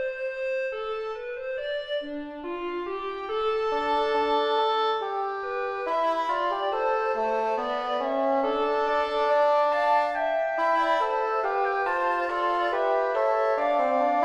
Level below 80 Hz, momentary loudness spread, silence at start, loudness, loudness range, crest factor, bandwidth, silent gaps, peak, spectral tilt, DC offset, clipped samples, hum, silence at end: -60 dBFS; 9 LU; 0 s; -26 LUFS; 5 LU; 14 dB; 9.4 kHz; none; -12 dBFS; -3.5 dB/octave; under 0.1%; under 0.1%; none; 0 s